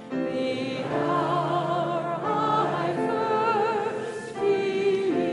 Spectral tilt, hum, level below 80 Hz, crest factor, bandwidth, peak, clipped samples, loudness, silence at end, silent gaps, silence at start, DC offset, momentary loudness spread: -6.5 dB/octave; none; -68 dBFS; 14 dB; 11.5 kHz; -10 dBFS; under 0.1%; -26 LUFS; 0 s; none; 0 s; under 0.1%; 5 LU